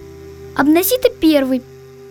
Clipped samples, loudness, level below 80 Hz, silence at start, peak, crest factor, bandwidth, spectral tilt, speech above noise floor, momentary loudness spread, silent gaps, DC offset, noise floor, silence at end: under 0.1%; -15 LUFS; -46 dBFS; 0 s; 0 dBFS; 16 dB; over 20 kHz; -4 dB/octave; 21 dB; 11 LU; none; under 0.1%; -35 dBFS; 0 s